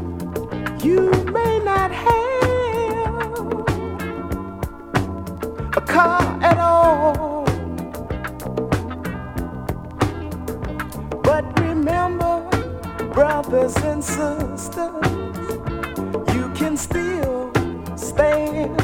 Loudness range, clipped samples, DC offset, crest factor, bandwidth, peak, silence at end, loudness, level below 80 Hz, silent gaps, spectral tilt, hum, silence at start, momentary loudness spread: 6 LU; under 0.1%; under 0.1%; 18 dB; 18 kHz; -2 dBFS; 0 s; -21 LUFS; -36 dBFS; none; -6 dB/octave; none; 0 s; 12 LU